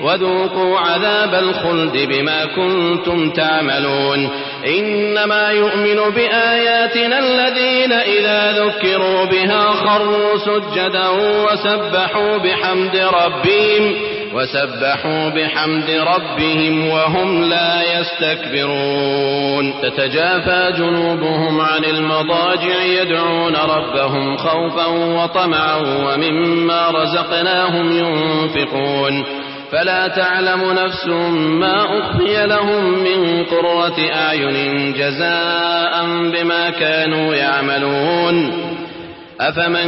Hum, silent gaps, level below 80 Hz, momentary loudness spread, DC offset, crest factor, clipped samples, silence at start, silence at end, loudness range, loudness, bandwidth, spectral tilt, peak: none; none; -52 dBFS; 4 LU; under 0.1%; 12 dB; under 0.1%; 0 s; 0 s; 3 LU; -15 LUFS; 5.8 kHz; -2 dB/octave; -4 dBFS